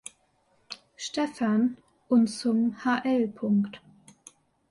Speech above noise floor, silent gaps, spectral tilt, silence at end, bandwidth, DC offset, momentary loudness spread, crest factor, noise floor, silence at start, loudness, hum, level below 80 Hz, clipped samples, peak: 42 dB; none; -5.5 dB/octave; 0.95 s; 11.5 kHz; under 0.1%; 19 LU; 16 dB; -68 dBFS; 0.7 s; -27 LUFS; none; -70 dBFS; under 0.1%; -12 dBFS